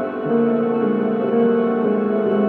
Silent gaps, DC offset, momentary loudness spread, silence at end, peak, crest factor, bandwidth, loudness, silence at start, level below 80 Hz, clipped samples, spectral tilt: none; under 0.1%; 2 LU; 0 s; -6 dBFS; 12 dB; 4.2 kHz; -19 LUFS; 0 s; -68 dBFS; under 0.1%; -10.5 dB/octave